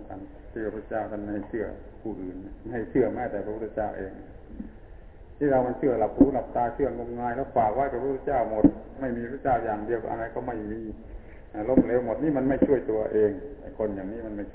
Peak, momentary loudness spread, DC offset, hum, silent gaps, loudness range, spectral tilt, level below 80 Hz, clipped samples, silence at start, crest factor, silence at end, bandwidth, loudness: -6 dBFS; 18 LU; under 0.1%; none; none; 6 LU; -12 dB/octave; -46 dBFS; under 0.1%; 0 s; 22 dB; 0 s; 3.9 kHz; -27 LUFS